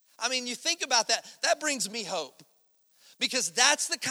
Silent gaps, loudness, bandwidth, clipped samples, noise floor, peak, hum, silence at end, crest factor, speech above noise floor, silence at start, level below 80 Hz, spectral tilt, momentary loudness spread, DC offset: none; -27 LUFS; over 20 kHz; under 0.1%; -67 dBFS; -4 dBFS; none; 0 s; 26 dB; 38 dB; 0.2 s; -86 dBFS; 0.5 dB/octave; 11 LU; under 0.1%